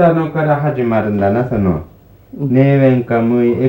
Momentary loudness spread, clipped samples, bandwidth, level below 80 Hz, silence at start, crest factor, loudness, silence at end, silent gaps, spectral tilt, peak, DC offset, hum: 6 LU; under 0.1%; 16 kHz; -42 dBFS; 0 s; 12 dB; -14 LUFS; 0 s; none; -10.5 dB/octave; 0 dBFS; under 0.1%; none